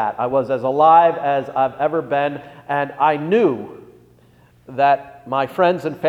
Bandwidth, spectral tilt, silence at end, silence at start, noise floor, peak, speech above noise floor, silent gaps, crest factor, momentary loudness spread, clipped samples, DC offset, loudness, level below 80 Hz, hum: 11 kHz; -7.5 dB/octave; 0 s; 0 s; -51 dBFS; -2 dBFS; 34 dB; none; 16 dB; 12 LU; under 0.1%; under 0.1%; -18 LUFS; -62 dBFS; 60 Hz at -55 dBFS